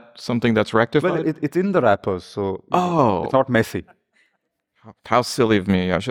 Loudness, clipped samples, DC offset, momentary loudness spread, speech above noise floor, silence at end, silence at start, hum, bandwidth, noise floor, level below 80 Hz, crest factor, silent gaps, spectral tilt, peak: -20 LUFS; under 0.1%; under 0.1%; 8 LU; 53 dB; 0 s; 0.15 s; none; 17.5 kHz; -72 dBFS; -52 dBFS; 18 dB; none; -6.5 dB/octave; -4 dBFS